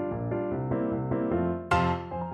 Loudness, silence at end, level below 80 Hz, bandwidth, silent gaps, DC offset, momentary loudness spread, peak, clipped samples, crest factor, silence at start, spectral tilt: -29 LUFS; 0 s; -48 dBFS; 9.6 kHz; none; under 0.1%; 5 LU; -12 dBFS; under 0.1%; 16 dB; 0 s; -8 dB/octave